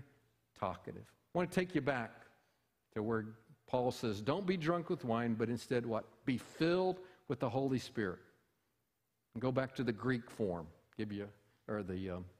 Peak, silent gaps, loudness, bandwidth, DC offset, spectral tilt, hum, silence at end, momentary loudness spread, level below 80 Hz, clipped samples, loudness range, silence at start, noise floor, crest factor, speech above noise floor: -20 dBFS; none; -39 LUFS; 15.5 kHz; under 0.1%; -6.5 dB/octave; none; 0.1 s; 12 LU; -68 dBFS; under 0.1%; 4 LU; 0 s; -85 dBFS; 20 dB; 47 dB